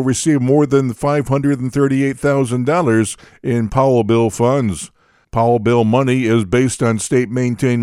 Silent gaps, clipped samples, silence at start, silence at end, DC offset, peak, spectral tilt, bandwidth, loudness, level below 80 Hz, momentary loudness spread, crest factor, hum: none; under 0.1%; 0 s; 0 s; under 0.1%; -2 dBFS; -6.5 dB/octave; 14 kHz; -16 LUFS; -42 dBFS; 6 LU; 14 dB; none